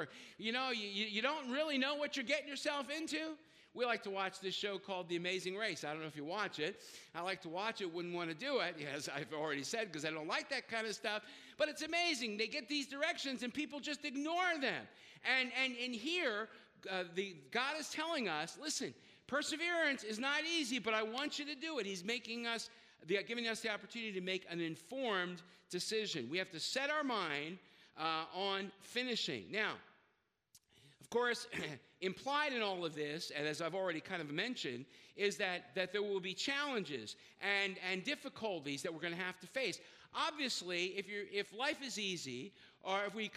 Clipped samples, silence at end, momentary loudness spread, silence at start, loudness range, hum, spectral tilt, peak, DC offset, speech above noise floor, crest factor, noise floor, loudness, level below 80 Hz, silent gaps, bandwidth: under 0.1%; 0 s; 8 LU; 0 s; 3 LU; none; -3 dB/octave; -20 dBFS; under 0.1%; 39 dB; 20 dB; -80 dBFS; -39 LUFS; -86 dBFS; none; 15.5 kHz